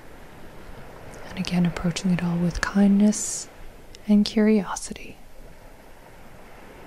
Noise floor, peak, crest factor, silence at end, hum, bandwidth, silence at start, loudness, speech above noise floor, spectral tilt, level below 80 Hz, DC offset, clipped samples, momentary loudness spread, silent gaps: -45 dBFS; -2 dBFS; 22 dB; 0 s; none; 14 kHz; 0.05 s; -23 LUFS; 23 dB; -5.5 dB/octave; -44 dBFS; under 0.1%; under 0.1%; 25 LU; none